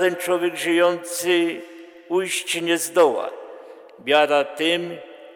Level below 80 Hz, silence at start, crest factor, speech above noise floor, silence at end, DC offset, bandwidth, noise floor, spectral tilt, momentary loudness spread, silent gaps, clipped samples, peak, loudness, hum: -76 dBFS; 0 s; 16 dB; 21 dB; 0 s; under 0.1%; 19 kHz; -42 dBFS; -2.5 dB/octave; 18 LU; none; under 0.1%; -6 dBFS; -21 LUFS; none